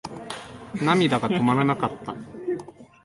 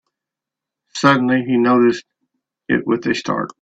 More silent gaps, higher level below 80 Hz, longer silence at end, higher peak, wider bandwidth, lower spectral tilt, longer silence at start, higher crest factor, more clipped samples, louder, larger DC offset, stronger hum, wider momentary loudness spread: neither; about the same, -58 dBFS vs -58 dBFS; about the same, 0.2 s vs 0.15 s; second, -6 dBFS vs 0 dBFS; first, 11.5 kHz vs 8 kHz; about the same, -6.5 dB/octave vs -5.5 dB/octave; second, 0.05 s vs 0.95 s; about the same, 20 dB vs 18 dB; neither; second, -23 LUFS vs -17 LUFS; neither; neither; first, 15 LU vs 9 LU